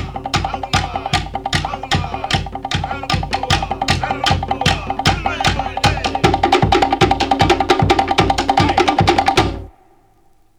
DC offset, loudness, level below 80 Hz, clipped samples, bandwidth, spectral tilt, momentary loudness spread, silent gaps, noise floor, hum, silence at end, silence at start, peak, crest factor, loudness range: under 0.1%; -16 LUFS; -30 dBFS; under 0.1%; 18.5 kHz; -4.5 dB/octave; 7 LU; none; -52 dBFS; none; 0.9 s; 0 s; -2 dBFS; 16 dB; 5 LU